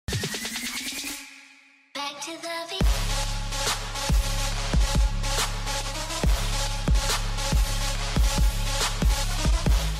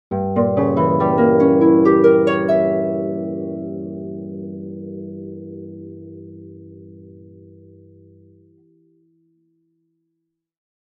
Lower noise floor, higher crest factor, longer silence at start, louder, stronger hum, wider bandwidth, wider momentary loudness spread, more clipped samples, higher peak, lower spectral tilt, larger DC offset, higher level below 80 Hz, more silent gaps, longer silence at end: second, -54 dBFS vs -76 dBFS; second, 12 dB vs 18 dB; about the same, 0.1 s vs 0.1 s; second, -27 LUFS vs -16 LUFS; neither; first, 16 kHz vs 6 kHz; second, 8 LU vs 24 LU; neither; second, -12 dBFS vs -2 dBFS; second, -3.5 dB/octave vs -10 dB/octave; neither; first, -26 dBFS vs -60 dBFS; neither; second, 0 s vs 3.65 s